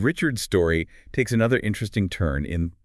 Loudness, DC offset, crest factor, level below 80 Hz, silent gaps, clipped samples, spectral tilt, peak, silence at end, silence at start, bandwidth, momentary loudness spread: -24 LUFS; under 0.1%; 16 dB; -40 dBFS; none; under 0.1%; -6 dB/octave; -8 dBFS; 0.15 s; 0 s; 12 kHz; 6 LU